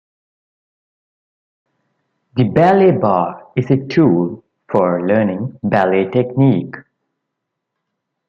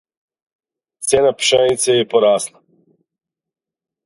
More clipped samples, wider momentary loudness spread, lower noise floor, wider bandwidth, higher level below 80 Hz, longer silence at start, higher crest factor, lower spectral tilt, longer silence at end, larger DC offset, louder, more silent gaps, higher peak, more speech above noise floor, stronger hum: neither; first, 11 LU vs 8 LU; second, -77 dBFS vs -83 dBFS; second, 6.8 kHz vs 11.5 kHz; about the same, -56 dBFS vs -56 dBFS; first, 2.35 s vs 1 s; about the same, 16 dB vs 18 dB; first, -9.5 dB/octave vs -2.5 dB/octave; about the same, 1.5 s vs 1.6 s; neither; about the same, -15 LUFS vs -15 LUFS; neither; about the same, -2 dBFS vs 0 dBFS; second, 63 dB vs 69 dB; neither